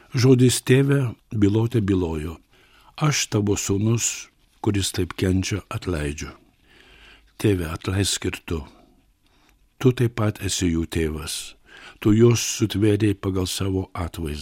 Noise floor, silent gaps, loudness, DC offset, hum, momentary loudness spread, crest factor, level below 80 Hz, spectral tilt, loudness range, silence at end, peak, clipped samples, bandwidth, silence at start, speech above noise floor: -60 dBFS; none; -22 LUFS; under 0.1%; none; 13 LU; 18 dB; -42 dBFS; -5 dB/octave; 5 LU; 0 s; -4 dBFS; under 0.1%; 16.5 kHz; 0.15 s; 38 dB